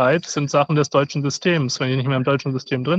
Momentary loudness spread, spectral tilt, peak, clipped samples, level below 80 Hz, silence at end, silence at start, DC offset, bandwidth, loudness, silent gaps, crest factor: 4 LU; -5.5 dB/octave; -4 dBFS; under 0.1%; -62 dBFS; 0 s; 0 s; under 0.1%; 8 kHz; -20 LUFS; none; 14 dB